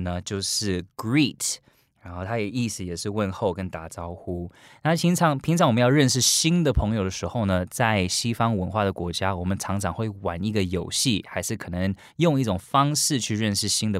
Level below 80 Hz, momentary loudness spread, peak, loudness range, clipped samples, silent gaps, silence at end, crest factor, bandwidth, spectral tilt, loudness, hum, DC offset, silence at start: -44 dBFS; 11 LU; -6 dBFS; 6 LU; under 0.1%; none; 0 s; 18 dB; 16 kHz; -4.5 dB/octave; -24 LUFS; none; under 0.1%; 0 s